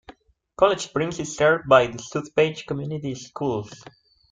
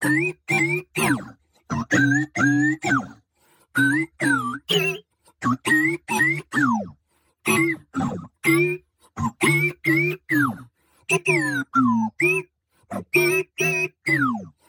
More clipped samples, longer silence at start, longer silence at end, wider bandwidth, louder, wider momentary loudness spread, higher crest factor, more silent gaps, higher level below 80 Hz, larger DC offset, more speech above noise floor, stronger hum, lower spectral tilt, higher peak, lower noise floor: neither; about the same, 0.1 s vs 0 s; first, 0.55 s vs 0.2 s; second, 9.4 kHz vs 18 kHz; about the same, -23 LUFS vs -21 LUFS; first, 13 LU vs 10 LU; first, 22 dB vs 16 dB; neither; first, -56 dBFS vs -62 dBFS; neither; second, 27 dB vs 46 dB; neither; about the same, -5 dB/octave vs -4.5 dB/octave; first, -2 dBFS vs -6 dBFS; second, -50 dBFS vs -66 dBFS